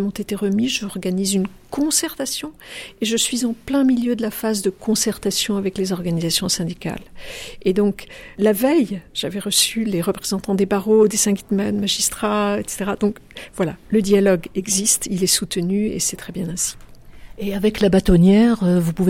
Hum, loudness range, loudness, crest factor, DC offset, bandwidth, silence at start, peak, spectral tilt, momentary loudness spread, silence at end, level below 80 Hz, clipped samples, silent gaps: none; 3 LU; -19 LUFS; 16 dB; under 0.1%; 16.5 kHz; 0 s; -4 dBFS; -4 dB/octave; 11 LU; 0 s; -40 dBFS; under 0.1%; none